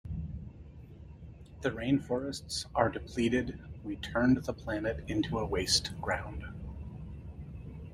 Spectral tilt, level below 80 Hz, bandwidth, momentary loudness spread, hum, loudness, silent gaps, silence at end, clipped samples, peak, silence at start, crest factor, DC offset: -4.5 dB/octave; -48 dBFS; 15.5 kHz; 21 LU; none; -33 LUFS; none; 0 s; under 0.1%; -10 dBFS; 0.05 s; 24 dB; under 0.1%